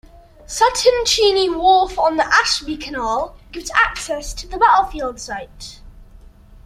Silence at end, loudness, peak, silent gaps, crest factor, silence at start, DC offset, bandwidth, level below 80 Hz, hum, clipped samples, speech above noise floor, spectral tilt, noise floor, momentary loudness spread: 0.6 s; -16 LUFS; -2 dBFS; none; 18 dB; 0.5 s; under 0.1%; 15.5 kHz; -38 dBFS; none; under 0.1%; 25 dB; -1.5 dB/octave; -43 dBFS; 15 LU